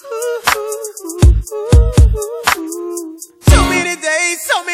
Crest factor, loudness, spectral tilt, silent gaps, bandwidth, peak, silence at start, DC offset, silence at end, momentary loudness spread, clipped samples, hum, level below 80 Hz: 14 dB; -14 LUFS; -4.5 dB/octave; none; 16 kHz; 0 dBFS; 0.05 s; under 0.1%; 0 s; 13 LU; 0.2%; none; -16 dBFS